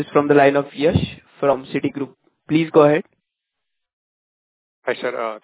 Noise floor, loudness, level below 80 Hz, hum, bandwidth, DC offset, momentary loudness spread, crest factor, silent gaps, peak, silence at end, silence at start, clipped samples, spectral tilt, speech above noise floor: -80 dBFS; -18 LUFS; -46 dBFS; none; 4 kHz; under 0.1%; 14 LU; 20 dB; 3.93-4.82 s; 0 dBFS; 0.05 s; 0 s; under 0.1%; -11 dB/octave; 62 dB